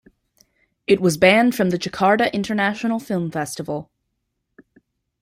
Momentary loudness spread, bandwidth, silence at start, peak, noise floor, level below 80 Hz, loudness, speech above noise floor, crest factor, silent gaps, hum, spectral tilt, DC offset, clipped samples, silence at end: 14 LU; 16 kHz; 0.9 s; -2 dBFS; -75 dBFS; -58 dBFS; -19 LUFS; 56 dB; 20 dB; none; none; -5 dB/octave; under 0.1%; under 0.1%; 1.4 s